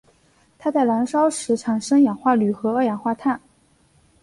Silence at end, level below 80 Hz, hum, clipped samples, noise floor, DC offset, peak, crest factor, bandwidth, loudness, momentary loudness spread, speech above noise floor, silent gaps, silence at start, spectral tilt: 0.85 s; -64 dBFS; none; under 0.1%; -59 dBFS; under 0.1%; -6 dBFS; 16 dB; 11.5 kHz; -21 LUFS; 7 LU; 39 dB; none; 0.6 s; -5.5 dB/octave